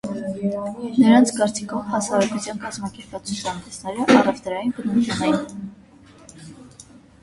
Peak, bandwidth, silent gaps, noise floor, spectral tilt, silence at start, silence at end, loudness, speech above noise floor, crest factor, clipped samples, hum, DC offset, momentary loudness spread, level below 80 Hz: 0 dBFS; 11.5 kHz; none; -47 dBFS; -5 dB/octave; 0.05 s; 0.4 s; -21 LUFS; 26 dB; 20 dB; under 0.1%; none; under 0.1%; 18 LU; -56 dBFS